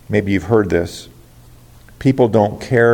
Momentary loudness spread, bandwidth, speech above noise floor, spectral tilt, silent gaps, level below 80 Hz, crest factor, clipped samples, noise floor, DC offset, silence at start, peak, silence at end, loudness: 8 LU; 17 kHz; 29 dB; -7.5 dB/octave; none; -44 dBFS; 16 dB; under 0.1%; -43 dBFS; under 0.1%; 0.1 s; 0 dBFS; 0 s; -16 LUFS